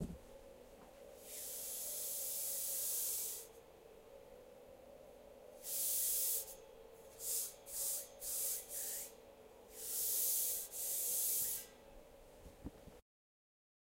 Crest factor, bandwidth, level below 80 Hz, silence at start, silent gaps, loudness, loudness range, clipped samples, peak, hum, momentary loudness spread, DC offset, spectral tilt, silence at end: 20 dB; 16 kHz; -68 dBFS; 0 s; none; -38 LUFS; 4 LU; under 0.1%; -24 dBFS; none; 25 LU; under 0.1%; -0.5 dB/octave; 1 s